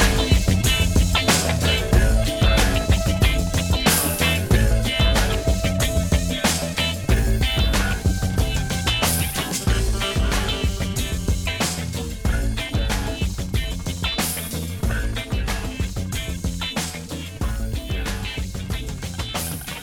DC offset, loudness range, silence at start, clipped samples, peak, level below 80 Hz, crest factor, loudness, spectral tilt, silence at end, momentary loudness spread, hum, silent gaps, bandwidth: under 0.1%; 8 LU; 0 s; under 0.1%; -4 dBFS; -24 dBFS; 18 dB; -22 LUFS; -4 dB/octave; 0 s; 9 LU; none; none; 18.5 kHz